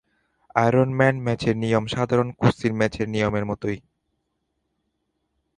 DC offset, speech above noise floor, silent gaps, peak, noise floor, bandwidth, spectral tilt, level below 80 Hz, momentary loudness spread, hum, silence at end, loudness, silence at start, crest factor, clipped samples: under 0.1%; 54 dB; none; -2 dBFS; -75 dBFS; 10.5 kHz; -7 dB/octave; -50 dBFS; 8 LU; none; 1.8 s; -22 LUFS; 0.55 s; 22 dB; under 0.1%